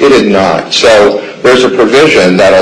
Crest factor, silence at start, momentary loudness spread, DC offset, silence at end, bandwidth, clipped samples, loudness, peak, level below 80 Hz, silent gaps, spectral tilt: 6 dB; 0 s; 4 LU; under 0.1%; 0 s; 12 kHz; 0.8%; -6 LUFS; 0 dBFS; -38 dBFS; none; -4 dB/octave